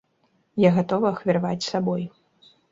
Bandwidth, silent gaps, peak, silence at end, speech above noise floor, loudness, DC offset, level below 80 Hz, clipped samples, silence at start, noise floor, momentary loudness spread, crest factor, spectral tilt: 7.8 kHz; none; -6 dBFS; 0.65 s; 45 dB; -23 LUFS; under 0.1%; -62 dBFS; under 0.1%; 0.55 s; -67 dBFS; 11 LU; 20 dB; -7 dB/octave